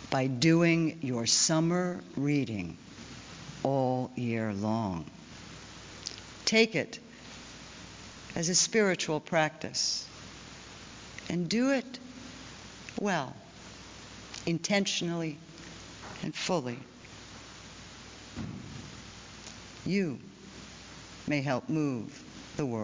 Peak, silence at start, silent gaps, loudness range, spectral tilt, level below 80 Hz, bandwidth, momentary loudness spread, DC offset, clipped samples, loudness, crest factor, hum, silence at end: -10 dBFS; 0 s; none; 9 LU; -4 dB/octave; -60 dBFS; 7.8 kHz; 21 LU; under 0.1%; under 0.1%; -30 LUFS; 22 dB; none; 0 s